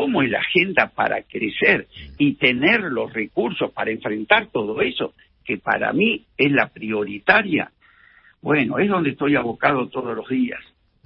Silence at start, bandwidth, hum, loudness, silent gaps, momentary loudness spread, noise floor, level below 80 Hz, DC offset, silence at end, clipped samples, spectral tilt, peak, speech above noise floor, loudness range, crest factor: 0 s; 5.8 kHz; none; -20 LUFS; none; 10 LU; -53 dBFS; -54 dBFS; under 0.1%; 0.45 s; under 0.1%; -10 dB/octave; 0 dBFS; 32 dB; 3 LU; 20 dB